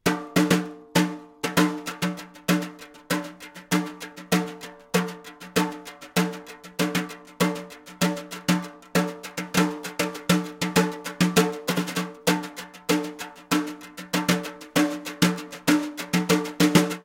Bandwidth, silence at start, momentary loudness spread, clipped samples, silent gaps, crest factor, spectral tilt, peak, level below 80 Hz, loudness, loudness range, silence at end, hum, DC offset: 17 kHz; 0.05 s; 13 LU; under 0.1%; none; 22 dB; -4.5 dB/octave; -4 dBFS; -60 dBFS; -25 LUFS; 4 LU; 0.05 s; none; under 0.1%